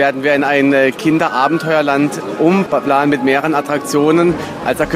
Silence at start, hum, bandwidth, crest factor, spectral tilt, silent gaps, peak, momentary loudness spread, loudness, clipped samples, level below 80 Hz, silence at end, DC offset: 0 s; none; 15.5 kHz; 14 dB; -5.5 dB/octave; none; 0 dBFS; 5 LU; -14 LUFS; under 0.1%; -46 dBFS; 0 s; under 0.1%